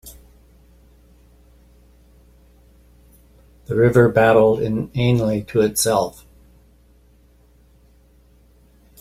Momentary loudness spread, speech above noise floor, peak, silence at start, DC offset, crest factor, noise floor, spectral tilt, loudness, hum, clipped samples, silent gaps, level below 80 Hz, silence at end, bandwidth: 9 LU; 36 dB; -2 dBFS; 0.05 s; under 0.1%; 20 dB; -53 dBFS; -5.5 dB/octave; -17 LUFS; none; under 0.1%; none; -48 dBFS; 2.9 s; 15.5 kHz